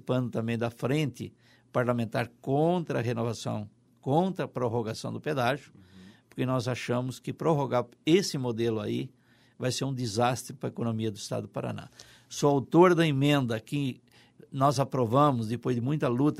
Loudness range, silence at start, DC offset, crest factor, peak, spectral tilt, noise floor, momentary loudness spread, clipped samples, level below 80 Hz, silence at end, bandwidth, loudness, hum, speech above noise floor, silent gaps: 5 LU; 0.05 s; under 0.1%; 20 dB; -8 dBFS; -6 dB/octave; -53 dBFS; 12 LU; under 0.1%; -66 dBFS; 0 s; 15 kHz; -29 LUFS; none; 26 dB; none